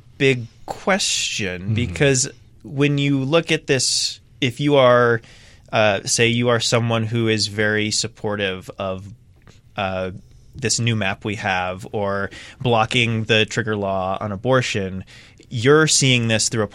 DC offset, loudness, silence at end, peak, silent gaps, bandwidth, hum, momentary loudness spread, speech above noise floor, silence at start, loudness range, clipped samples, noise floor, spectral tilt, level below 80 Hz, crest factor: under 0.1%; -19 LUFS; 0.05 s; -2 dBFS; none; 15.5 kHz; none; 11 LU; 29 dB; 0.2 s; 6 LU; under 0.1%; -48 dBFS; -4 dB/octave; -52 dBFS; 18 dB